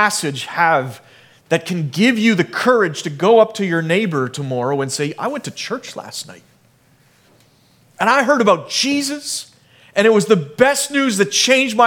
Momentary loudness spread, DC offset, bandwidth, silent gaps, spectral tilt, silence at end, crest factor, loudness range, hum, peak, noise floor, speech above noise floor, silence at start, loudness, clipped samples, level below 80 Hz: 12 LU; under 0.1%; 18.5 kHz; none; -4 dB/octave; 0 s; 18 dB; 8 LU; none; 0 dBFS; -54 dBFS; 38 dB; 0 s; -16 LUFS; under 0.1%; -64 dBFS